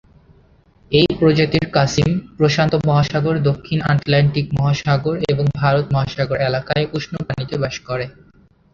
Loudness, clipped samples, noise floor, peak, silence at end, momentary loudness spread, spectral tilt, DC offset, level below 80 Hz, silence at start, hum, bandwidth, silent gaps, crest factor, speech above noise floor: -18 LUFS; under 0.1%; -52 dBFS; -2 dBFS; 0.65 s; 8 LU; -6.5 dB/octave; under 0.1%; -42 dBFS; 0.9 s; none; 7.4 kHz; none; 16 dB; 35 dB